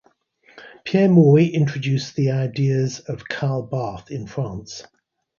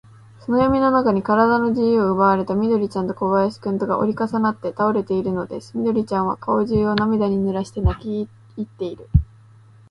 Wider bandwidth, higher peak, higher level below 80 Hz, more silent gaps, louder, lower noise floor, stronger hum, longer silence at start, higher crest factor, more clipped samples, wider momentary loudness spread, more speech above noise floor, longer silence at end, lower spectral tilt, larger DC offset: second, 7.2 kHz vs 10.5 kHz; about the same, -2 dBFS vs 0 dBFS; second, -56 dBFS vs -34 dBFS; neither; about the same, -20 LUFS vs -20 LUFS; first, -57 dBFS vs -48 dBFS; neither; about the same, 0.55 s vs 0.5 s; about the same, 18 dB vs 18 dB; neither; first, 18 LU vs 12 LU; first, 38 dB vs 29 dB; about the same, 0.55 s vs 0.65 s; about the same, -7.5 dB/octave vs -8.5 dB/octave; neither